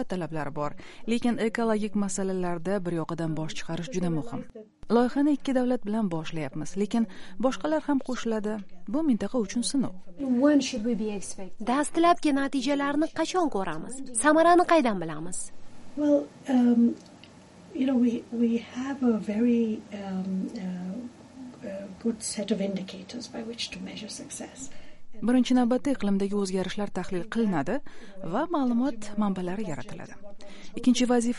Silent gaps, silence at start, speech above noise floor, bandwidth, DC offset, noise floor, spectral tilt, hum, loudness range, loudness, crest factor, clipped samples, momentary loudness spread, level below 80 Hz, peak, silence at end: none; 0 s; 24 dB; 11.5 kHz; under 0.1%; -50 dBFS; -5 dB/octave; none; 7 LU; -27 LUFS; 18 dB; under 0.1%; 16 LU; -52 dBFS; -8 dBFS; 0 s